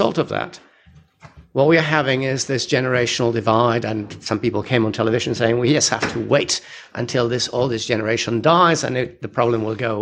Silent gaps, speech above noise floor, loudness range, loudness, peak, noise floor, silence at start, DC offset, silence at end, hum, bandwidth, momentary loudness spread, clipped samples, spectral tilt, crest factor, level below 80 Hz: none; 32 dB; 1 LU; -19 LUFS; -2 dBFS; -50 dBFS; 0 s; under 0.1%; 0 s; none; 10.5 kHz; 9 LU; under 0.1%; -4.5 dB/octave; 18 dB; -54 dBFS